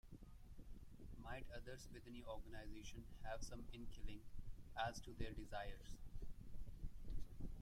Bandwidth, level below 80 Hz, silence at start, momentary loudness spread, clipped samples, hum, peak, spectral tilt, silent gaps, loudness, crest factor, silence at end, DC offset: 15 kHz; -54 dBFS; 0.05 s; 12 LU; under 0.1%; none; -32 dBFS; -5 dB/octave; none; -55 LUFS; 18 dB; 0 s; under 0.1%